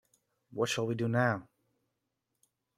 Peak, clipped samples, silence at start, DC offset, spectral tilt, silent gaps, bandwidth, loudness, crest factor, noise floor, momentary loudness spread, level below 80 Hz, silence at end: -14 dBFS; under 0.1%; 0.55 s; under 0.1%; -5.5 dB/octave; none; 15 kHz; -32 LUFS; 22 dB; -84 dBFS; 9 LU; -74 dBFS; 1.35 s